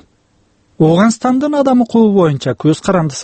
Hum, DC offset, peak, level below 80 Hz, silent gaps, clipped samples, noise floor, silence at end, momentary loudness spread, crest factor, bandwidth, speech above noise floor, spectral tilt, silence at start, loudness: none; under 0.1%; 0 dBFS; -48 dBFS; none; under 0.1%; -56 dBFS; 0 s; 5 LU; 12 dB; 8.8 kHz; 44 dB; -6.5 dB/octave; 0.8 s; -12 LUFS